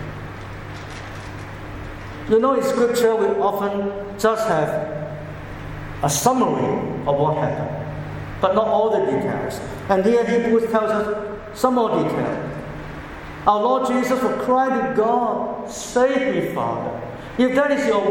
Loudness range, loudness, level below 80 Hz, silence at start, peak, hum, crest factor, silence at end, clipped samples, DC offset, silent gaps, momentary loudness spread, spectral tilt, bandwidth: 2 LU; -20 LUFS; -44 dBFS; 0 s; -2 dBFS; none; 18 dB; 0 s; under 0.1%; under 0.1%; none; 16 LU; -5.5 dB/octave; 17.5 kHz